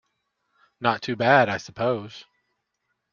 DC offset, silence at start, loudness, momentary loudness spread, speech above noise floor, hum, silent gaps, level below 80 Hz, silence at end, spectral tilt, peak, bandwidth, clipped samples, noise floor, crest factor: under 0.1%; 0.8 s; -23 LUFS; 10 LU; 55 dB; none; none; -66 dBFS; 0.9 s; -5.5 dB/octave; -2 dBFS; 7.2 kHz; under 0.1%; -77 dBFS; 24 dB